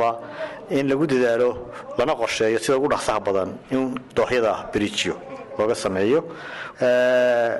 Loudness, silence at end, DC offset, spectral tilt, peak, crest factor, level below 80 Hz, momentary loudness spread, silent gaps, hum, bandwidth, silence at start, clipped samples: -22 LUFS; 0 s; under 0.1%; -4.5 dB/octave; -10 dBFS; 12 dB; -54 dBFS; 14 LU; none; none; 12 kHz; 0 s; under 0.1%